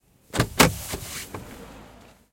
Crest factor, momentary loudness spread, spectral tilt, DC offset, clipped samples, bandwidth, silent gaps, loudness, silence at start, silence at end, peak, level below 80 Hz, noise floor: 26 dB; 23 LU; -3.5 dB/octave; under 0.1%; under 0.1%; 17 kHz; none; -24 LUFS; 0.35 s; 0.4 s; -2 dBFS; -42 dBFS; -50 dBFS